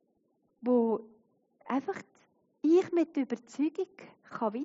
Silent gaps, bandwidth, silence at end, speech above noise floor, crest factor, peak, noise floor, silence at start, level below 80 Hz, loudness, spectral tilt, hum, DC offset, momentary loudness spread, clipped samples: none; 7.6 kHz; 0 s; 44 dB; 16 dB; -16 dBFS; -74 dBFS; 0.65 s; -88 dBFS; -31 LUFS; -5.5 dB/octave; none; under 0.1%; 14 LU; under 0.1%